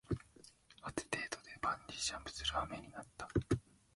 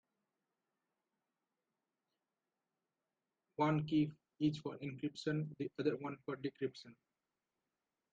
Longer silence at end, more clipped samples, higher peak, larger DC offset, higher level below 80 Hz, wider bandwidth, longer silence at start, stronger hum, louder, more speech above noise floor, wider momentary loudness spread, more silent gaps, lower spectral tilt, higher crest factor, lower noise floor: second, 0.35 s vs 1.2 s; neither; about the same, -20 dBFS vs -22 dBFS; neither; first, -58 dBFS vs -78 dBFS; first, 11.5 kHz vs 7.8 kHz; second, 0.1 s vs 3.6 s; neither; about the same, -41 LUFS vs -40 LUFS; second, 23 dB vs over 51 dB; first, 13 LU vs 9 LU; neither; second, -4 dB/octave vs -7.5 dB/octave; about the same, 22 dB vs 20 dB; second, -63 dBFS vs under -90 dBFS